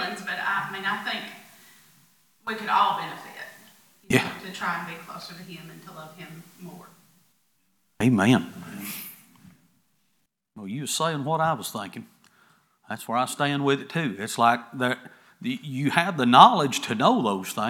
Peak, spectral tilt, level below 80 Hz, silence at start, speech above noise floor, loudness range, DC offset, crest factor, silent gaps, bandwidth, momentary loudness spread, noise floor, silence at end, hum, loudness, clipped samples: 0 dBFS; -4.5 dB/octave; -68 dBFS; 0 s; 49 dB; 10 LU; under 0.1%; 26 dB; none; 19.5 kHz; 21 LU; -73 dBFS; 0 s; none; -24 LUFS; under 0.1%